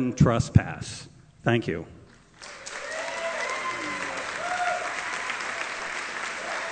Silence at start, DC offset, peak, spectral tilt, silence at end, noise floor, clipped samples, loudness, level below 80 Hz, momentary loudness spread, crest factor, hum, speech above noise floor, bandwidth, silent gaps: 0 s; under 0.1%; -2 dBFS; -5 dB/octave; 0 s; -48 dBFS; under 0.1%; -28 LUFS; -48 dBFS; 15 LU; 26 dB; none; 24 dB; 9.4 kHz; none